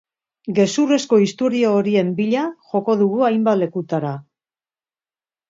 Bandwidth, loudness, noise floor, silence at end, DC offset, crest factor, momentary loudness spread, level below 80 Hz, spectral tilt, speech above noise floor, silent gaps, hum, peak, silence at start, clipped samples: 7.8 kHz; -18 LUFS; under -90 dBFS; 1.3 s; under 0.1%; 16 dB; 7 LU; -68 dBFS; -6 dB/octave; over 72 dB; none; none; -4 dBFS; 0.45 s; under 0.1%